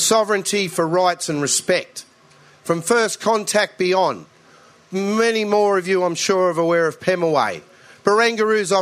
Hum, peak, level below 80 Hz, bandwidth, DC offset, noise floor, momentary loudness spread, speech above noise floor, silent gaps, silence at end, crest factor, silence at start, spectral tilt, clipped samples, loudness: none; 0 dBFS; -68 dBFS; 15.5 kHz; under 0.1%; -50 dBFS; 7 LU; 32 dB; none; 0 s; 18 dB; 0 s; -3 dB/octave; under 0.1%; -19 LUFS